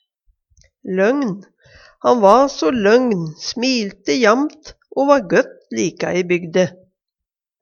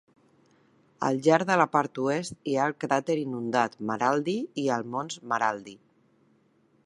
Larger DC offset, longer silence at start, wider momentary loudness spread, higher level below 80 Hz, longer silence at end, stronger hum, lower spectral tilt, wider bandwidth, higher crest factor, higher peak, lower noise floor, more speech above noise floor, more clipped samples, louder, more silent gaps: neither; second, 0.85 s vs 1 s; first, 11 LU vs 8 LU; first, -56 dBFS vs -74 dBFS; second, 0.9 s vs 1.1 s; neither; about the same, -5 dB/octave vs -5.5 dB/octave; second, 7.4 kHz vs 11.5 kHz; about the same, 18 dB vs 22 dB; first, 0 dBFS vs -6 dBFS; first, -85 dBFS vs -65 dBFS; first, 69 dB vs 39 dB; neither; first, -17 LUFS vs -27 LUFS; neither